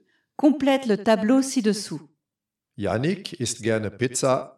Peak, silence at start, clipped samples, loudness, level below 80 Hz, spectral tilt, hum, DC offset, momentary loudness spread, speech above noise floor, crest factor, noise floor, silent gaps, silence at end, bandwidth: -8 dBFS; 0.4 s; under 0.1%; -23 LUFS; -64 dBFS; -5 dB/octave; none; under 0.1%; 10 LU; 64 dB; 16 dB; -87 dBFS; none; 0.05 s; 13.5 kHz